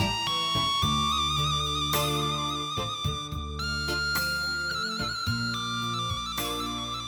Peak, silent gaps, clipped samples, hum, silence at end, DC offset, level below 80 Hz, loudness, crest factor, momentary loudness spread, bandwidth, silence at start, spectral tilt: -12 dBFS; none; under 0.1%; none; 0 s; under 0.1%; -42 dBFS; -27 LUFS; 16 dB; 6 LU; over 20 kHz; 0 s; -3 dB/octave